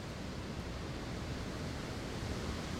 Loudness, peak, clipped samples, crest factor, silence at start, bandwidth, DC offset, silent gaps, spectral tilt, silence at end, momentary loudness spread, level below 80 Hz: -42 LUFS; -26 dBFS; under 0.1%; 14 dB; 0 s; 16.5 kHz; under 0.1%; none; -5 dB/octave; 0 s; 3 LU; -48 dBFS